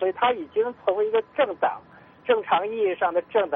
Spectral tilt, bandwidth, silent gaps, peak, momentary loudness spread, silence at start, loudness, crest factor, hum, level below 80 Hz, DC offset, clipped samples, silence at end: -7.5 dB/octave; 3.8 kHz; none; -8 dBFS; 5 LU; 0 s; -24 LUFS; 16 dB; none; -70 dBFS; under 0.1%; under 0.1%; 0 s